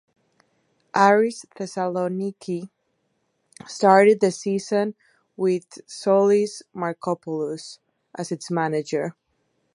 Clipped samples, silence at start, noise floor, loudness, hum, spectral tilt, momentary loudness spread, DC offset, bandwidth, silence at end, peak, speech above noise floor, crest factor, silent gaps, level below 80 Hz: under 0.1%; 0.95 s; -72 dBFS; -22 LUFS; none; -5.5 dB/octave; 17 LU; under 0.1%; 11.5 kHz; 0.65 s; -2 dBFS; 50 dB; 22 dB; none; -76 dBFS